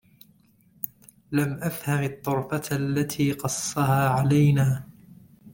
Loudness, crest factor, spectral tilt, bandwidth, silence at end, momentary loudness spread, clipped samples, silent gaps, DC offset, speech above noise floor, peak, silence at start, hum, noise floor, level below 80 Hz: -25 LUFS; 20 dB; -6 dB/octave; 17 kHz; 0.05 s; 12 LU; under 0.1%; none; under 0.1%; 36 dB; -6 dBFS; 0.85 s; none; -60 dBFS; -56 dBFS